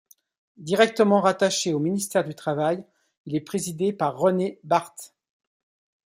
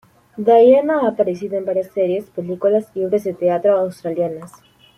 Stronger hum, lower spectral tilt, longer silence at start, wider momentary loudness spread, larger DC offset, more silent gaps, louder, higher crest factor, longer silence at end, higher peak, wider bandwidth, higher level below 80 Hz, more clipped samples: neither; second, -4.5 dB/octave vs -7.5 dB/octave; first, 0.6 s vs 0.35 s; about the same, 12 LU vs 11 LU; neither; first, 3.17-3.25 s vs none; second, -24 LUFS vs -17 LUFS; about the same, 20 dB vs 16 dB; first, 1 s vs 0.5 s; second, -6 dBFS vs -2 dBFS; first, 16 kHz vs 13 kHz; second, -70 dBFS vs -64 dBFS; neither